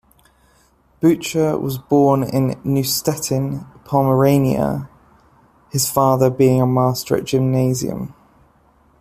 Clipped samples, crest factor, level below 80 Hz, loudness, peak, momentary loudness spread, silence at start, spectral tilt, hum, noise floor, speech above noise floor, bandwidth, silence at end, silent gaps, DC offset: under 0.1%; 16 dB; -50 dBFS; -18 LUFS; -2 dBFS; 11 LU; 1 s; -6 dB/octave; none; -56 dBFS; 39 dB; 15.5 kHz; 0.9 s; none; under 0.1%